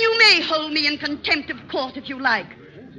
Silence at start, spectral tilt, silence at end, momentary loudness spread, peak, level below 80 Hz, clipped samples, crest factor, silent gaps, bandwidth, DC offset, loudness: 0 s; -2 dB/octave; 0 s; 15 LU; -4 dBFS; -58 dBFS; under 0.1%; 18 dB; none; 9.6 kHz; under 0.1%; -19 LUFS